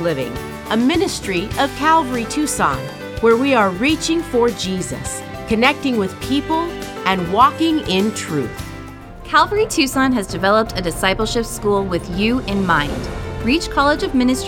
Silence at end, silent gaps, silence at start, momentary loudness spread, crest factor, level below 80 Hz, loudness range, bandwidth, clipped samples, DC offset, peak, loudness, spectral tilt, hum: 0 s; none; 0 s; 11 LU; 18 dB; -36 dBFS; 2 LU; 18 kHz; under 0.1%; under 0.1%; 0 dBFS; -18 LUFS; -4.5 dB/octave; none